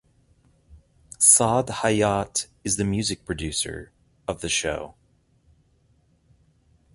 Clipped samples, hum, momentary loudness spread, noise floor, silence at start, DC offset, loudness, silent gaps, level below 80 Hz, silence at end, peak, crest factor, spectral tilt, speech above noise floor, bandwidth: under 0.1%; none; 19 LU; -63 dBFS; 0.7 s; under 0.1%; -22 LUFS; none; -48 dBFS; 2.05 s; -2 dBFS; 24 dB; -3 dB/octave; 40 dB; 12 kHz